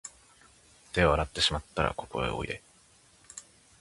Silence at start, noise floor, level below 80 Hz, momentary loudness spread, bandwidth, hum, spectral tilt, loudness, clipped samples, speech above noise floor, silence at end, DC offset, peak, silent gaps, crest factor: 0.05 s; -61 dBFS; -44 dBFS; 21 LU; 11.5 kHz; none; -4 dB/octave; -29 LUFS; under 0.1%; 32 dB; 0.4 s; under 0.1%; -8 dBFS; none; 24 dB